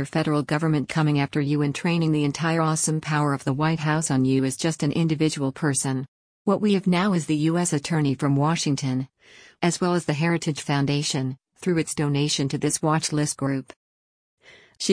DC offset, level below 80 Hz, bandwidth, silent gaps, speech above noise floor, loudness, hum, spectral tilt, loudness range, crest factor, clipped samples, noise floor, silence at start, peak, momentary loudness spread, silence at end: under 0.1%; -60 dBFS; 10.5 kHz; 6.08-6.45 s, 13.76-14.37 s; over 67 dB; -23 LUFS; none; -5 dB/octave; 2 LU; 16 dB; under 0.1%; under -90 dBFS; 0 s; -8 dBFS; 5 LU; 0 s